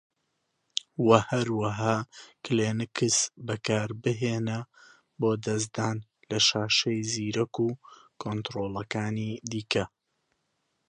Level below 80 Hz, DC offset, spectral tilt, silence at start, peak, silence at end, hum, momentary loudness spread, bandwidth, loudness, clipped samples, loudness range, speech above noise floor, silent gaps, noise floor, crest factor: -62 dBFS; under 0.1%; -4 dB/octave; 0.75 s; -2 dBFS; 1 s; none; 12 LU; 11 kHz; -28 LUFS; under 0.1%; 5 LU; 50 dB; none; -78 dBFS; 26 dB